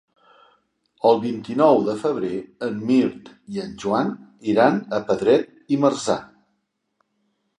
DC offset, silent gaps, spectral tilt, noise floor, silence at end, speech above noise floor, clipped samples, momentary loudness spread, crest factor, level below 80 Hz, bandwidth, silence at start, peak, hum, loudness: under 0.1%; none; -6 dB/octave; -73 dBFS; 1.35 s; 53 dB; under 0.1%; 11 LU; 20 dB; -64 dBFS; 11 kHz; 1.05 s; -2 dBFS; none; -21 LUFS